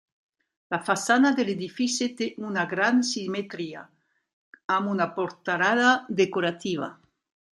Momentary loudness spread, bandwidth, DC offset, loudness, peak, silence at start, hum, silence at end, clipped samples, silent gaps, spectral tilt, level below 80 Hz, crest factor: 12 LU; 12 kHz; under 0.1%; -25 LUFS; -6 dBFS; 0.7 s; none; 0.65 s; under 0.1%; 4.33-4.53 s, 4.64-4.69 s; -4 dB/octave; -74 dBFS; 20 dB